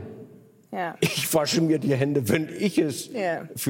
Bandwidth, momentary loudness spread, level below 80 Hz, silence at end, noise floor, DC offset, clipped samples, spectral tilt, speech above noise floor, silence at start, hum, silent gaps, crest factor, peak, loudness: 17 kHz; 10 LU; -66 dBFS; 0 s; -49 dBFS; under 0.1%; under 0.1%; -5 dB/octave; 25 dB; 0 s; none; none; 20 dB; -6 dBFS; -25 LUFS